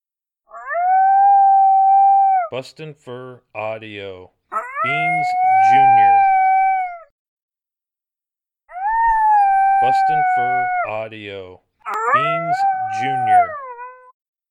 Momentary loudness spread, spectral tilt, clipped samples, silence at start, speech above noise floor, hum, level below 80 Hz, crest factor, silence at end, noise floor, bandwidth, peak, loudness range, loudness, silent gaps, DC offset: 22 LU; -5 dB/octave; under 0.1%; 0.55 s; 72 dB; none; -52 dBFS; 12 dB; 0.55 s; -90 dBFS; 9.6 kHz; -4 dBFS; 5 LU; -15 LUFS; 7.11-7.37 s, 7.43-7.49 s; under 0.1%